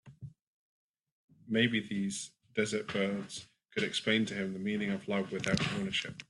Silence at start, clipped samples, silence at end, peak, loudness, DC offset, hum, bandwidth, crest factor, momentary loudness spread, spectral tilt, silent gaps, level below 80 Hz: 0.05 s; under 0.1%; 0.05 s; -12 dBFS; -33 LUFS; under 0.1%; none; 11.5 kHz; 22 dB; 12 LU; -4.5 dB/octave; 0.41-0.94 s, 1.00-1.04 s, 1.12-1.28 s; -68 dBFS